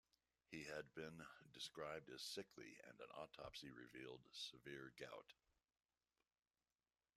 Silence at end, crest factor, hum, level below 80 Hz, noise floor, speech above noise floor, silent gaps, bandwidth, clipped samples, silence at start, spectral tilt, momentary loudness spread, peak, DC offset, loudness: 1.85 s; 20 dB; none; -84 dBFS; under -90 dBFS; over 33 dB; none; 14 kHz; under 0.1%; 0.5 s; -3 dB/octave; 9 LU; -38 dBFS; under 0.1%; -56 LUFS